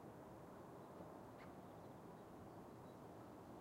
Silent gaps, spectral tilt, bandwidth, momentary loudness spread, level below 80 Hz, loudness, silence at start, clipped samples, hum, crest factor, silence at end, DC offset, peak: none; -7 dB/octave; 16 kHz; 1 LU; -78 dBFS; -59 LUFS; 0 s; under 0.1%; none; 16 dB; 0 s; under 0.1%; -42 dBFS